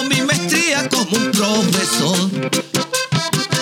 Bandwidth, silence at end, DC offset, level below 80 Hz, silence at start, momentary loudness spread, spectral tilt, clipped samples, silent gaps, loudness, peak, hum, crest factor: 19.5 kHz; 0 s; under 0.1%; -60 dBFS; 0 s; 4 LU; -3.5 dB/octave; under 0.1%; none; -16 LUFS; -2 dBFS; none; 14 dB